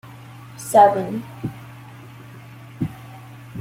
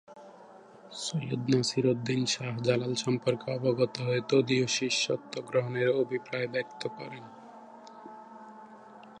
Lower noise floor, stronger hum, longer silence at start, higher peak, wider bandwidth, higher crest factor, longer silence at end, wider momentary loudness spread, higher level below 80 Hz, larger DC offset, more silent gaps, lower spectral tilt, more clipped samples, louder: second, -40 dBFS vs -52 dBFS; neither; about the same, 0.05 s vs 0.1 s; first, -2 dBFS vs -12 dBFS; first, 16.5 kHz vs 11 kHz; about the same, 22 dB vs 20 dB; about the same, 0 s vs 0 s; first, 27 LU vs 22 LU; first, -56 dBFS vs -74 dBFS; neither; neither; first, -6 dB/octave vs -4.5 dB/octave; neither; first, -20 LUFS vs -29 LUFS